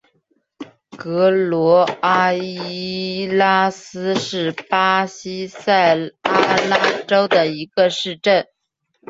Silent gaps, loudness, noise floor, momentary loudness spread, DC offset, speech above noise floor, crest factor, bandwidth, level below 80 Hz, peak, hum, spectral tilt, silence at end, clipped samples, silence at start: none; -17 LUFS; -73 dBFS; 11 LU; under 0.1%; 55 dB; 16 dB; 8 kHz; -62 dBFS; -2 dBFS; none; -4.5 dB/octave; 0.65 s; under 0.1%; 0.6 s